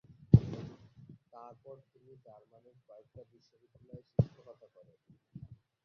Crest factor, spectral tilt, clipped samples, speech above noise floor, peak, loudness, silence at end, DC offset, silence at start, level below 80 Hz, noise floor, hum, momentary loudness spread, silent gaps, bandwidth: 30 dB; -11.5 dB/octave; under 0.1%; 14 dB; -8 dBFS; -31 LUFS; 1.6 s; under 0.1%; 0.35 s; -52 dBFS; -57 dBFS; none; 30 LU; none; 6 kHz